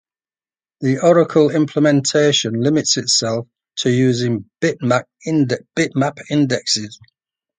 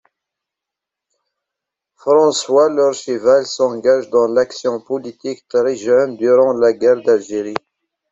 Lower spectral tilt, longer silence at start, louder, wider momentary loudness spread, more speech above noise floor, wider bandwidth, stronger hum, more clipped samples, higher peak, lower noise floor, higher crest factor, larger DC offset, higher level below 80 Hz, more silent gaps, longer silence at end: about the same, -4.5 dB/octave vs -4 dB/octave; second, 0.8 s vs 2.05 s; about the same, -17 LUFS vs -15 LUFS; second, 8 LU vs 11 LU; first, over 73 dB vs 69 dB; first, 9.6 kHz vs 8 kHz; neither; neither; about the same, -2 dBFS vs -2 dBFS; first, under -90 dBFS vs -84 dBFS; about the same, 16 dB vs 14 dB; neither; about the same, -60 dBFS vs -64 dBFS; neither; about the same, 0.65 s vs 0.55 s